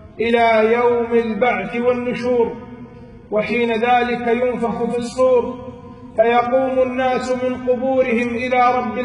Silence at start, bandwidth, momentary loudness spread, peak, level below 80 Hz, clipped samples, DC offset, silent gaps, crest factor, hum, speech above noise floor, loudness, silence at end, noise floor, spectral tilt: 0 s; 11 kHz; 8 LU; -4 dBFS; -48 dBFS; under 0.1%; under 0.1%; none; 14 dB; none; 21 dB; -18 LUFS; 0 s; -38 dBFS; -6 dB/octave